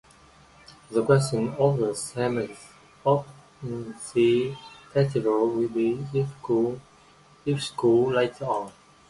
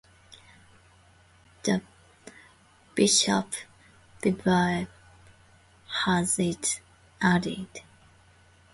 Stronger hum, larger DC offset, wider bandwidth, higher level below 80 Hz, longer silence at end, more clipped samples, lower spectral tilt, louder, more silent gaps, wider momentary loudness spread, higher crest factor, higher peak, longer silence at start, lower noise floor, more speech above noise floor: neither; neither; about the same, 11.5 kHz vs 11.5 kHz; about the same, -60 dBFS vs -58 dBFS; second, 0.4 s vs 0.9 s; neither; first, -6.5 dB/octave vs -3.5 dB/octave; about the same, -25 LUFS vs -26 LUFS; neither; about the same, 13 LU vs 15 LU; about the same, 20 dB vs 22 dB; about the same, -6 dBFS vs -8 dBFS; first, 0.7 s vs 0.3 s; about the same, -55 dBFS vs -58 dBFS; about the same, 30 dB vs 33 dB